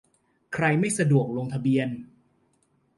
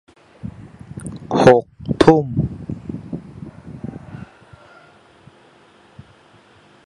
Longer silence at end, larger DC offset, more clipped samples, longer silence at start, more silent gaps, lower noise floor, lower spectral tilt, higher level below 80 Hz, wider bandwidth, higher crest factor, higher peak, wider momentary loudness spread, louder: second, 0.9 s vs 2.6 s; neither; neither; about the same, 0.5 s vs 0.45 s; neither; first, -68 dBFS vs -50 dBFS; about the same, -6 dB/octave vs -7 dB/octave; second, -64 dBFS vs -44 dBFS; about the same, 11.5 kHz vs 11 kHz; about the same, 18 dB vs 22 dB; second, -8 dBFS vs 0 dBFS; second, 11 LU vs 25 LU; second, -25 LUFS vs -17 LUFS